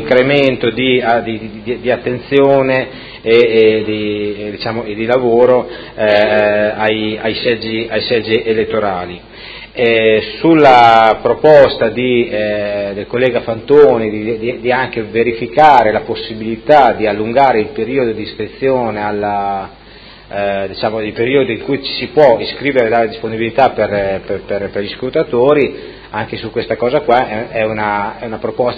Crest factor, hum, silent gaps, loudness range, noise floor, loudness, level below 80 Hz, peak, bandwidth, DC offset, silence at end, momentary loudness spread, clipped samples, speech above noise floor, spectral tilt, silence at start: 12 dB; none; none; 6 LU; -37 dBFS; -13 LUFS; -42 dBFS; 0 dBFS; 8 kHz; under 0.1%; 0 s; 13 LU; 0.4%; 25 dB; -7 dB/octave; 0 s